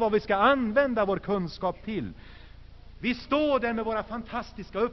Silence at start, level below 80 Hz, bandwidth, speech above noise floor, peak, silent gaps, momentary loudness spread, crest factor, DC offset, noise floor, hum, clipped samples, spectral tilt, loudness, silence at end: 0 s; -48 dBFS; 6.2 kHz; 20 dB; -10 dBFS; none; 12 LU; 18 dB; under 0.1%; -47 dBFS; none; under 0.1%; -4 dB/octave; -27 LUFS; 0 s